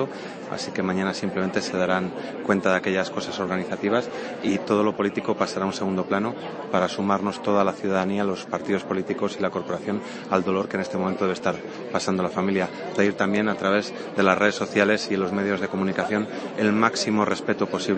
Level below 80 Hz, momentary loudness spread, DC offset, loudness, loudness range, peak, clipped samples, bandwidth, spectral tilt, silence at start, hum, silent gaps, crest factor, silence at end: -66 dBFS; 7 LU; under 0.1%; -24 LUFS; 3 LU; -2 dBFS; under 0.1%; 8.8 kHz; -5.5 dB/octave; 0 s; none; none; 22 dB; 0 s